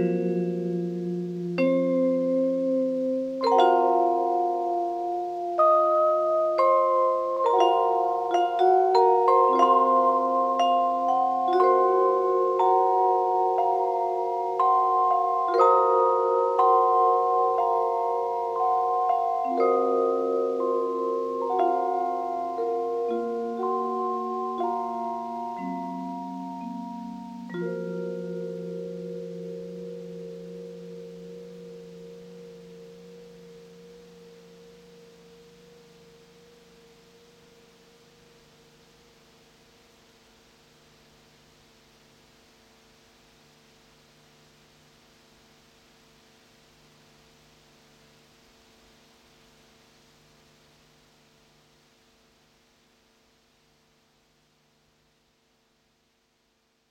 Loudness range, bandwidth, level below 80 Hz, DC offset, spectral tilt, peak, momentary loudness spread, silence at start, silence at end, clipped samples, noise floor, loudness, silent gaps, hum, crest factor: 17 LU; 8.8 kHz; -72 dBFS; under 0.1%; -7 dB/octave; -8 dBFS; 19 LU; 0 s; 22.6 s; under 0.1%; -70 dBFS; -24 LUFS; none; none; 18 dB